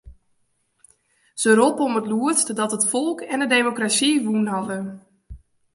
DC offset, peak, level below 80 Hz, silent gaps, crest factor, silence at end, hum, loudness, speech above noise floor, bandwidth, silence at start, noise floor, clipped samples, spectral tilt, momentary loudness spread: under 0.1%; -2 dBFS; -54 dBFS; none; 20 dB; 0.4 s; none; -20 LUFS; 47 dB; 11.5 kHz; 0.05 s; -68 dBFS; under 0.1%; -3 dB/octave; 10 LU